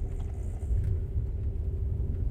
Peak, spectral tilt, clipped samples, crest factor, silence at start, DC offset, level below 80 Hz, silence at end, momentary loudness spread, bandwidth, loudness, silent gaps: -18 dBFS; -9.5 dB/octave; under 0.1%; 12 dB; 0 s; under 0.1%; -32 dBFS; 0 s; 6 LU; 9.2 kHz; -33 LUFS; none